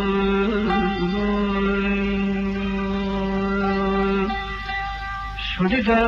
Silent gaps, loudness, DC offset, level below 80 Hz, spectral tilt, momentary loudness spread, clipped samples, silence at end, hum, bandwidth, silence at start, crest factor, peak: none; -22 LUFS; under 0.1%; -34 dBFS; -7.5 dB/octave; 6 LU; under 0.1%; 0 s; none; 7 kHz; 0 s; 14 dB; -8 dBFS